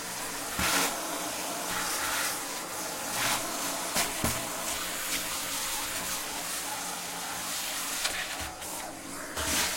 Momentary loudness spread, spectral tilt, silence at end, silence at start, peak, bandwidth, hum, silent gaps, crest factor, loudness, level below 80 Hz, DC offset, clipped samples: 7 LU; -1 dB/octave; 0 s; 0 s; -12 dBFS; 16.5 kHz; none; none; 20 dB; -31 LUFS; -54 dBFS; under 0.1%; under 0.1%